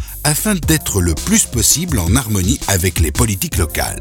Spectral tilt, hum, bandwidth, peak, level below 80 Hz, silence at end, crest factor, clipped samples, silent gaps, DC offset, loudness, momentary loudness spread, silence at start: -3.5 dB/octave; none; over 20 kHz; 0 dBFS; -24 dBFS; 0 s; 16 dB; under 0.1%; none; under 0.1%; -15 LUFS; 5 LU; 0 s